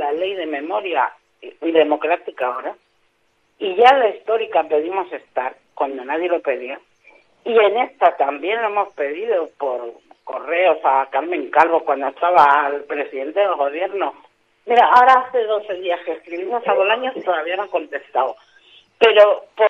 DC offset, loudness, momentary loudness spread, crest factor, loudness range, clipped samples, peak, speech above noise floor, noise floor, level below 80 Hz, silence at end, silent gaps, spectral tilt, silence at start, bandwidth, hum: under 0.1%; -18 LUFS; 13 LU; 18 dB; 5 LU; under 0.1%; 0 dBFS; 46 dB; -64 dBFS; -70 dBFS; 0 s; none; -4 dB/octave; 0 s; 7.6 kHz; none